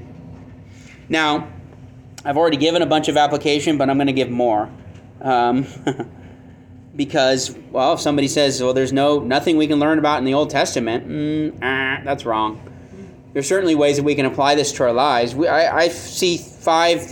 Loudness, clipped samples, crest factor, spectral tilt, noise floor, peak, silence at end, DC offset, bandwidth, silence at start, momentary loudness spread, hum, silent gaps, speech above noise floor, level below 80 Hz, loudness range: -18 LUFS; under 0.1%; 14 dB; -4.5 dB/octave; -42 dBFS; -4 dBFS; 0 s; under 0.1%; 18 kHz; 0 s; 9 LU; none; none; 24 dB; -54 dBFS; 4 LU